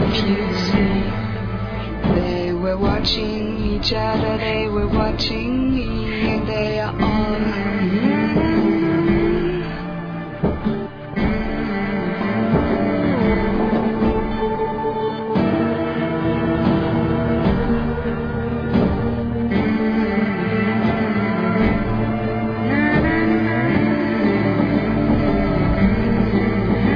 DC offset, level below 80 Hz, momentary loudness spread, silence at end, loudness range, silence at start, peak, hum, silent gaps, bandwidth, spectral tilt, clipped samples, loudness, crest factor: under 0.1%; -30 dBFS; 6 LU; 0 s; 3 LU; 0 s; -4 dBFS; none; none; 5.4 kHz; -8 dB/octave; under 0.1%; -20 LUFS; 14 dB